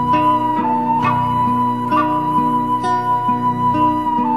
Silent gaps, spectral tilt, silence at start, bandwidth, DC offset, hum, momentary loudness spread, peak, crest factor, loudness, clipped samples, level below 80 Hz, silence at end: none; -7.5 dB/octave; 0 s; 12.5 kHz; 0.7%; 60 Hz at -35 dBFS; 2 LU; -4 dBFS; 12 dB; -16 LUFS; under 0.1%; -48 dBFS; 0 s